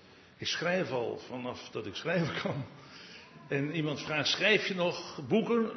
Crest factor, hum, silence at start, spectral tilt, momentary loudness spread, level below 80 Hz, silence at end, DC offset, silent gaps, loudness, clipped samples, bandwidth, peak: 22 dB; none; 0.05 s; -4.5 dB/octave; 18 LU; -74 dBFS; 0 s; under 0.1%; none; -32 LUFS; under 0.1%; 6.4 kHz; -12 dBFS